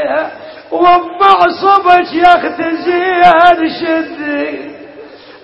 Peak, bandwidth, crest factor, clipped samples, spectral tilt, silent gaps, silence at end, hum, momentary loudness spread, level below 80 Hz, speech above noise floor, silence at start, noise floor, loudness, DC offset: 0 dBFS; 7.2 kHz; 10 dB; 0.7%; -5.5 dB/octave; none; 0.1 s; none; 14 LU; -46 dBFS; 24 dB; 0 s; -34 dBFS; -10 LUFS; under 0.1%